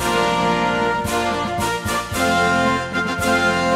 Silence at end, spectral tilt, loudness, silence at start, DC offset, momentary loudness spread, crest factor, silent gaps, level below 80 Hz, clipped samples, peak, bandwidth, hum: 0 s; -4 dB/octave; -19 LUFS; 0 s; under 0.1%; 5 LU; 14 dB; none; -40 dBFS; under 0.1%; -6 dBFS; 16 kHz; none